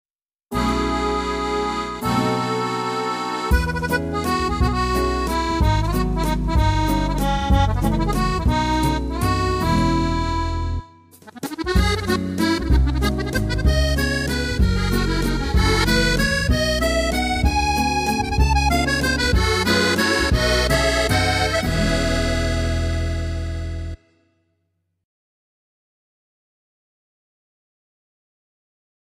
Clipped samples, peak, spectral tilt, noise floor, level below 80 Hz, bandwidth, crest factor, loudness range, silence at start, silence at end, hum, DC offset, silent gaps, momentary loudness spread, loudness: under 0.1%; -4 dBFS; -5 dB/octave; -72 dBFS; -26 dBFS; 16 kHz; 16 dB; 5 LU; 0.5 s; 5.2 s; none; under 0.1%; none; 6 LU; -20 LUFS